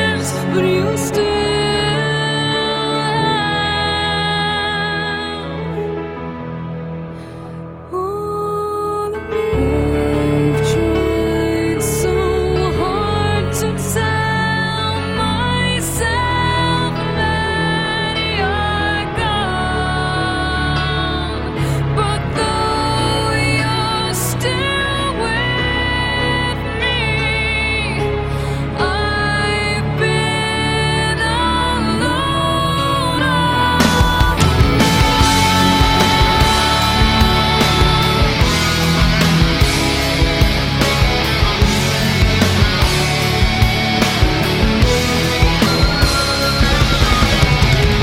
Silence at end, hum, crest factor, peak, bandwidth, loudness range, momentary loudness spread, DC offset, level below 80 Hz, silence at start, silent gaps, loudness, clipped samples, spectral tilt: 0 s; none; 14 dB; 0 dBFS; 16.5 kHz; 5 LU; 7 LU; under 0.1%; -24 dBFS; 0 s; none; -15 LUFS; under 0.1%; -4.5 dB/octave